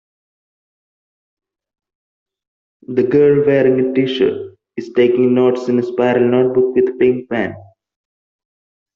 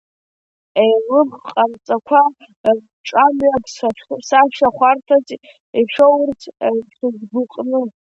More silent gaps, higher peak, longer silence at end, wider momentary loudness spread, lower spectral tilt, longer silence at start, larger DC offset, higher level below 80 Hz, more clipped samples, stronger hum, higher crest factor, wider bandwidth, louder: second, none vs 2.56-2.64 s, 2.93-3.04 s, 5.60-5.73 s; about the same, -2 dBFS vs 0 dBFS; first, 1.3 s vs 0.2 s; about the same, 9 LU vs 10 LU; first, -6 dB/octave vs -4.5 dB/octave; first, 2.9 s vs 0.75 s; neither; about the same, -58 dBFS vs -58 dBFS; neither; neither; about the same, 14 dB vs 16 dB; second, 6.6 kHz vs 8 kHz; about the same, -15 LUFS vs -16 LUFS